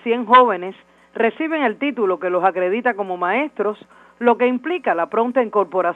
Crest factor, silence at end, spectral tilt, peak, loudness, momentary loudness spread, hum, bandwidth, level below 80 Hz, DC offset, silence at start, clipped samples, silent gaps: 18 dB; 0 s; -7 dB/octave; 0 dBFS; -19 LUFS; 11 LU; none; 4.4 kHz; -72 dBFS; under 0.1%; 0.05 s; under 0.1%; none